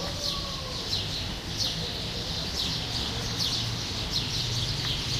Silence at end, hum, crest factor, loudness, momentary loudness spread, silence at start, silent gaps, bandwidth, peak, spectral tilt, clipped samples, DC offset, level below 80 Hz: 0 s; none; 16 dB; -29 LUFS; 4 LU; 0 s; none; 16 kHz; -16 dBFS; -3 dB/octave; under 0.1%; under 0.1%; -42 dBFS